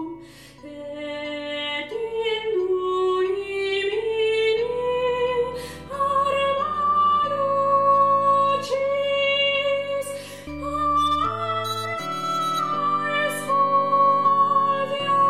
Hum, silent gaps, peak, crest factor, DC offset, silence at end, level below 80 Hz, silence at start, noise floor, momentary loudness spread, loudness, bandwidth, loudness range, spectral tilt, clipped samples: none; none; -8 dBFS; 14 dB; 0.2%; 0 s; -54 dBFS; 0 s; -44 dBFS; 12 LU; -22 LUFS; 15.5 kHz; 5 LU; -4 dB/octave; under 0.1%